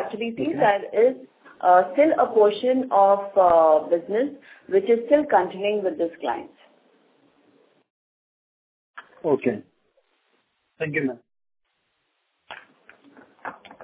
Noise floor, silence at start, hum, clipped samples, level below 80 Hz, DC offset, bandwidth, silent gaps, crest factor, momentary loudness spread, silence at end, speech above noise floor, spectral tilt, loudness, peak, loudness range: -73 dBFS; 0 s; none; under 0.1%; -68 dBFS; under 0.1%; 4 kHz; 7.90-8.94 s; 18 dB; 20 LU; 0 s; 52 dB; -9.5 dB/octave; -21 LUFS; -4 dBFS; 15 LU